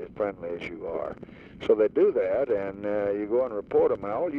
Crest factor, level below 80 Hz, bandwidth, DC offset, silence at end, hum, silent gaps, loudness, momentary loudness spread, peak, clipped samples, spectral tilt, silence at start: 16 dB; -58 dBFS; 5.2 kHz; under 0.1%; 0 s; none; none; -27 LUFS; 12 LU; -10 dBFS; under 0.1%; -8 dB/octave; 0 s